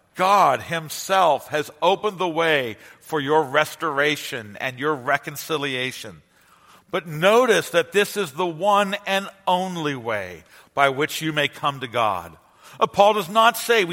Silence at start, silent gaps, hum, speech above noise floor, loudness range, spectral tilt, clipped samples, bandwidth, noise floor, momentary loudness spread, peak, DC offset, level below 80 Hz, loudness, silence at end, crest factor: 0.15 s; none; none; 33 dB; 3 LU; -3.5 dB/octave; under 0.1%; 16.5 kHz; -54 dBFS; 11 LU; 0 dBFS; under 0.1%; -66 dBFS; -21 LUFS; 0 s; 22 dB